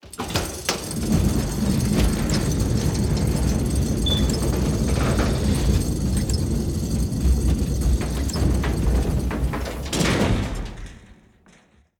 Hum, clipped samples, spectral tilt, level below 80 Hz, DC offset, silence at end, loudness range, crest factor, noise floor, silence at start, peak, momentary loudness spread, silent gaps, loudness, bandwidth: none; under 0.1%; -5.5 dB/octave; -26 dBFS; under 0.1%; 0.85 s; 2 LU; 16 dB; -55 dBFS; 0.05 s; -6 dBFS; 5 LU; none; -23 LUFS; 19.5 kHz